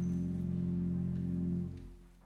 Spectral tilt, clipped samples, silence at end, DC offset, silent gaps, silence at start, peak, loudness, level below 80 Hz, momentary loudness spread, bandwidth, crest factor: -10.5 dB/octave; under 0.1%; 0.05 s; under 0.1%; none; 0 s; -26 dBFS; -37 LUFS; -54 dBFS; 10 LU; 6.4 kHz; 10 dB